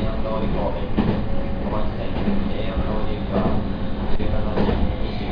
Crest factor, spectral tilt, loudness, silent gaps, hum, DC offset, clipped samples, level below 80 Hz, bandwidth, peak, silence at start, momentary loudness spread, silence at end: 14 dB; -9.5 dB/octave; -25 LUFS; none; none; under 0.1%; under 0.1%; -26 dBFS; 5.2 kHz; -6 dBFS; 0 s; 5 LU; 0 s